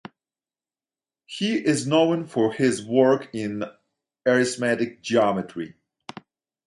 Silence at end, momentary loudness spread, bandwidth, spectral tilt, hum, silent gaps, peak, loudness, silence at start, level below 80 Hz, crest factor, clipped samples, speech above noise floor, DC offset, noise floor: 0.95 s; 16 LU; 11.5 kHz; -5 dB/octave; none; none; -4 dBFS; -23 LUFS; 1.3 s; -66 dBFS; 20 dB; under 0.1%; over 68 dB; under 0.1%; under -90 dBFS